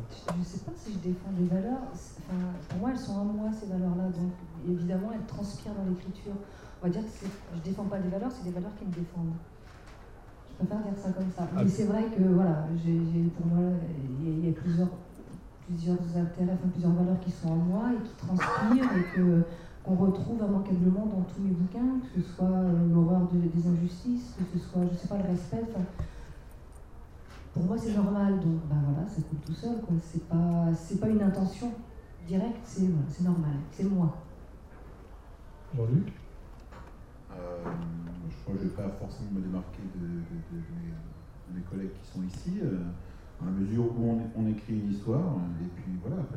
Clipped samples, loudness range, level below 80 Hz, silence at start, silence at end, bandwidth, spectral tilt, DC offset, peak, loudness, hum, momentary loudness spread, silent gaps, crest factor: under 0.1%; 9 LU; -50 dBFS; 0 s; 0 s; 9.4 kHz; -9 dB/octave; under 0.1%; -14 dBFS; -31 LUFS; none; 18 LU; none; 16 dB